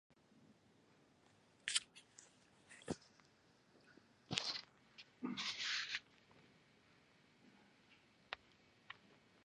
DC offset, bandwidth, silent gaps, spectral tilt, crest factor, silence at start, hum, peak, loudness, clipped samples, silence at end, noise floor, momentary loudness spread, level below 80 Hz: under 0.1%; 11 kHz; none; -1.5 dB/octave; 36 dB; 0.35 s; none; -16 dBFS; -44 LUFS; under 0.1%; 0.3 s; -72 dBFS; 22 LU; -82 dBFS